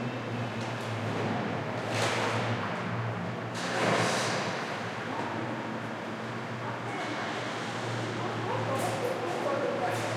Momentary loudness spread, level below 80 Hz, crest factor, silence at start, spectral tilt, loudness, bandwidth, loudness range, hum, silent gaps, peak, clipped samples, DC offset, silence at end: 7 LU; -68 dBFS; 16 dB; 0 s; -5 dB/octave; -32 LUFS; 15.5 kHz; 4 LU; none; none; -14 dBFS; under 0.1%; under 0.1%; 0 s